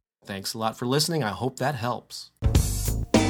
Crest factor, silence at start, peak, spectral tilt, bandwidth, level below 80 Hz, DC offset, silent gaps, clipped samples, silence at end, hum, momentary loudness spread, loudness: 20 dB; 0.25 s; -6 dBFS; -4.5 dB/octave; over 20 kHz; -32 dBFS; under 0.1%; none; under 0.1%; 0 s; none; 10 LU; -27 LUFS